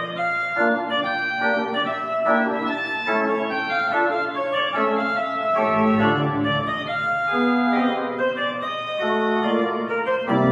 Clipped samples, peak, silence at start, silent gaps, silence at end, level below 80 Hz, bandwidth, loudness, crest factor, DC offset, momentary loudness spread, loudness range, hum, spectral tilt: under 0.1%; -6 dBFS; 0 s; none; 0 s; -62 dBFS; 7.6 kHz; -22 LUFS; 16 dB; under 0.1%; 5 LU; 1 LU; none; -6.5 dB/octave